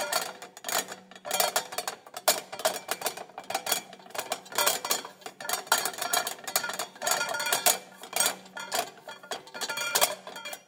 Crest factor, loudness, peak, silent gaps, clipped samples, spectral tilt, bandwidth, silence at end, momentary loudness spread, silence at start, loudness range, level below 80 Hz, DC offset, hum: 26 dB; -29 LUFS; -6 dBFS; none; under 0.1%; 0.5 dB/octave; 19 kHz; 0.1 s; 14 LU; 0 s; 3 LU; -84 dBFS; under 0.1%; none